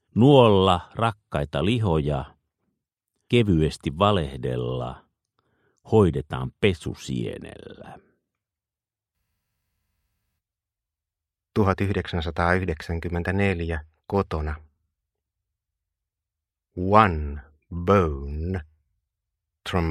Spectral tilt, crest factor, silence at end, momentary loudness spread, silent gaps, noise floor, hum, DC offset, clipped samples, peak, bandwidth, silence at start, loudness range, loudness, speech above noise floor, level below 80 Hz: -7 dB/octave; 24 dB; 0 s; 16 LU; none; under -90 dBFS; none; under 0.1%; under 0.1%; 0 dBFS; 12 kHz; 0.15 s; 7 LU; -23 LUFS; over 67 dB; -40 dBFS